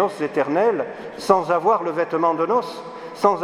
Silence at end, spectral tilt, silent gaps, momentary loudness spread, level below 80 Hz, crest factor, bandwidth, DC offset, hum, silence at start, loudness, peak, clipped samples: 0 s; -6 dB/octave; none; 12 LU; -66 dBFS; 20 dB; 14.5 kHz; under 0.1%; none; 0 s; -21 LUFS; 0 dBFS; under 0.1%